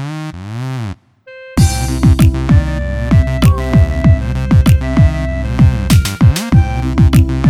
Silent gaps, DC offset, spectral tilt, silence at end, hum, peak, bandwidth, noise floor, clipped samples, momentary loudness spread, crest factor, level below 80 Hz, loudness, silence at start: none; under 0.1%; -6.5 dB/octave; 0 s; none; 0 dBFS; 15.5 kHz; -37 dBFS; under 0.1%; 12 LU; 12 dB; -18 dBFS; -12 LUFS; 0 s